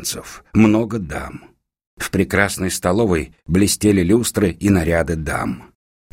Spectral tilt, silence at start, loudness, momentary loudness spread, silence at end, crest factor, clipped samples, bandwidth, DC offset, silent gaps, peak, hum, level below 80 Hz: -5 dB/octave; 0 s; -18 LUFS; 13 LU; 0.5 s; 18 dB; under 0.1%; 16.5 kHz; under 0.1%; 1.87-1.97 s; 0 dBFS; none; -38 dBFS